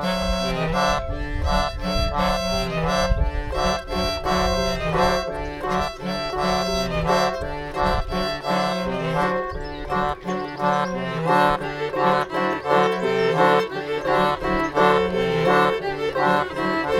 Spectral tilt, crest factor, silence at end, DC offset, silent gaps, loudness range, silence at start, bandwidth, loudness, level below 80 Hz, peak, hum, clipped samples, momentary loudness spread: -5 dB/octave; 18 dB; 0 s; under 0.1%; none; 4 LU; 0 s; 17.5 kHz; -22 LUFS; -32 dBFS; -4 dBFS; none; under 0.1%; 7 LU